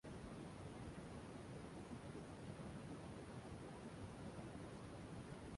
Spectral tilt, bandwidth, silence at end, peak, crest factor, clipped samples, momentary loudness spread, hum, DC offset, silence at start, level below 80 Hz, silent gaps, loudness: -6 dB/octave; 11.5 kHz; 0 s; -38 dBFS; 14 dB; under 0.1%; 1 LU; none; under 0.1%; 0.05 s; -66 dBFS; none; -54 LUFS